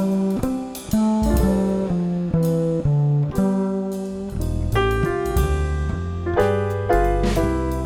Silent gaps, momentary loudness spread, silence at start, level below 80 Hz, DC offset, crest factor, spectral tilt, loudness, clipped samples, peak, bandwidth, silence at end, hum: none; 7 LU; 0 s; -28 dBFS; under 0.1%; 14 dB; -7.5 dB/octave; -21 LUFS; under 0.1%; -6 dBFS; 18 kHz; 0 s; none